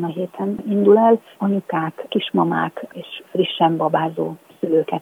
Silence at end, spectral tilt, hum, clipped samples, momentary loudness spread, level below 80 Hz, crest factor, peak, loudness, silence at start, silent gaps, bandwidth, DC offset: 0 s; -8 dB/octave; none; under 0.1%; 13 LU; -70 dBFS; 16 dB; -2 dBFS; -19 LUFS; 0 s; none; 15 kHz; under 0.1%